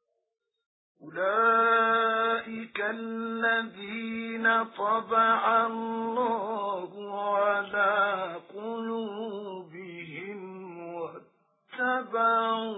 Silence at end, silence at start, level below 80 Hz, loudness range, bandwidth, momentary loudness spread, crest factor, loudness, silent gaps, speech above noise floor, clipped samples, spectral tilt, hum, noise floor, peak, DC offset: 0 s; 1 s; -80 dBFS; 9 LU; 4 kHz; 17 LU; 16 dB; -27 LUFS; none; 36 dB; under 0.1%; -8 dB/octave; none; -64 dBFS; -12 dBFS; under 0.1%